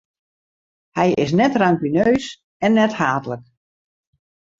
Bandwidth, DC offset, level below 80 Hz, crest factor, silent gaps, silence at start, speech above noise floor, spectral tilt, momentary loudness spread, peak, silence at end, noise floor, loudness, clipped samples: 7.8 kHz; under 0.1%; -54 dBFS; 18 dB; 2.44-2.60 s; 0.95 s; over 73 dB; -6.5 dB/octave; 14 LU; -2 dBFS; 1.2 s; under -90 dBFS; -18 LUFS; under 0.1%